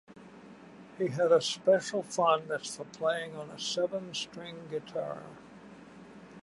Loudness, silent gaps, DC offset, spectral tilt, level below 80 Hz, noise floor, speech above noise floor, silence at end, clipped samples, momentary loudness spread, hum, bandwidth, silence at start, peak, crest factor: -31 LUFS; none; under 0.1%; -3.5 dB/octave; -76 dBFS; -51 dBFS; 20 dB; 0.05 s; under 0.1%; 25 LU; none; 11.5 kHz; 0.1 s; -12 dBFS; 20 dB